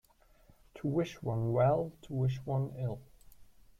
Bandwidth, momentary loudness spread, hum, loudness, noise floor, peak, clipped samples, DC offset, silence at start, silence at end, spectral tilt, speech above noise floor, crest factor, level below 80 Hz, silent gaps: 7.4 kHz; 11 LU; none; -34 LUFS; -63 dBFS; -18 dBFS; under 0.1%; under 0.1%; 0.75 s; 0.35 s; -8.5 dB/octave; 31 dB; 16 dB; -60 dBFS; none